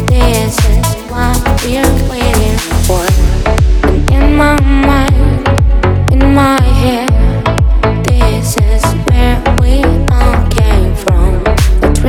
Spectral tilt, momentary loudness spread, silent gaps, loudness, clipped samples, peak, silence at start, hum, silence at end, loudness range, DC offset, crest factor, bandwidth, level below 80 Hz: -6 dB/octave; 3 LU; none; -11 LUFS; under 0.1%; 0 dBFS; 0 s; none; 0 s; 2 LU; under 0.1%; 8 dB; 17.5 kHz; -10 dBFS